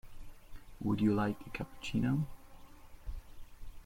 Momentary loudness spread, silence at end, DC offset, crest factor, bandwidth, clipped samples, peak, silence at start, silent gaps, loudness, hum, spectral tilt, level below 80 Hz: 24 LU; 0 s; under 0.1%; 18 dB; 16.5 kHz; under 0.1%; -20 dBFS; 0.05 s; none; -35 LUFS; none; -7.5 dB/octave; -50 dBFS